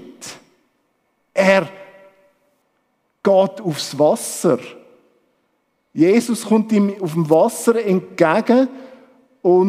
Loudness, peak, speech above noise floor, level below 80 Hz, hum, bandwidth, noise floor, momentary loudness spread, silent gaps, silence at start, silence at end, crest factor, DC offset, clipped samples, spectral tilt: -17 LUFS; 0 dBFS; 51 dB; -72 dBFS; none; 16 kHz; -67 dBFS; 16 LU; none; 0 s; 0 s; 18 dB; under 0.1%; under 0.1%; -5.5 dB/octave